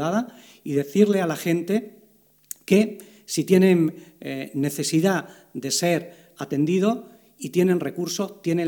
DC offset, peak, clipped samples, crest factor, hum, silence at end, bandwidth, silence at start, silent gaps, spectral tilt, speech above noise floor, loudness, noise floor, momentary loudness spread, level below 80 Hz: under 0.1%; -4 dBFS; under 0.1%; 18 dB; none; 0 s; 20 kHz; 0 s; none; -5.5 dB/octave; 36 dB; -23 LUFS; -58 dBFS; 18 LU; -70 dBFS